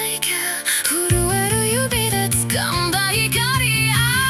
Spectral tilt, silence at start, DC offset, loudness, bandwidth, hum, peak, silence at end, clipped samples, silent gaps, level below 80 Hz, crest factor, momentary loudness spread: -3 dB/octave; 0 s; under 0.1%; -17 LUFS; 16.5 kHz; none; 0 dBFS; 0 s; under 0.1%; none; -36 dBFS; 18 dB; 3 LU